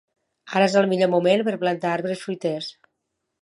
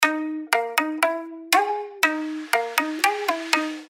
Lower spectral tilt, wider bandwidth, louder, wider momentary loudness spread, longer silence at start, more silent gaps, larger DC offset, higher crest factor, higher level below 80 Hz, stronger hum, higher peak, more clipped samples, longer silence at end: first, -5.5 dB/octave vs 0.5 dB/octave; second, 11.5 kHz vs 16.5 kHz; about the same, -22 LUFS vs -23 LUFS; first, 9 LU vs 6 LU; first, 0.45 s vs 0 s; neither; neither; about the same, 18 dB vs 22 dB; about the same, -76 dBFS vs -78 dBFS; neither; about the same, -4 dBFS vs -2 dBFS; neither; first, 0.7 s vs 0.05 s